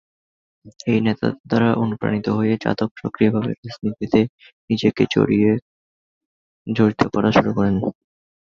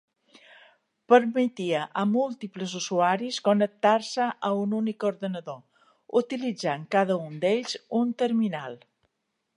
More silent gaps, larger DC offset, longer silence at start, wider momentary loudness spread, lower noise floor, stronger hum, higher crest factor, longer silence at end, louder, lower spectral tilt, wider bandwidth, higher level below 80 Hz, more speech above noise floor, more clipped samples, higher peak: first, 1.40-1.44 s, 2.91-2.95 s, 3.58-3.63 s, 4.29-4.38 s, 4.53-4.68 s, 5.62-6.65 s vs none; neither; second, 0.65 s vs 1.1 s; about the same, 10 LU vs 11 LU; first, under -90 dBFS vs -79 dBFS; neither; about the same, 18 dB vs 22 dB; second, 0.6 s vs 0.8 s; first, -20 LUFS vs -26 LUFS; first, -7.5 dB/octave vs -5 dB/octave; second, 7 kHz vs 11 kHz; first, -50 dBFS vs -80 dBFS; first, over 71 dB vs 54 dB; neither; first, -2 dBFS vs -6 dBFS